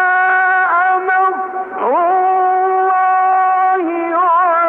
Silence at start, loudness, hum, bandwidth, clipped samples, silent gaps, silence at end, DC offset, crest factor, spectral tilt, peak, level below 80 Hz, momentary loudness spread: 0 s; -13 LUFS; none; 3.9 kHz; under 0.1%; none; 0 s; under 0.1%; 6 dB; -6 dB/octave; -6 dBFS; -70 dBFS; 5 LU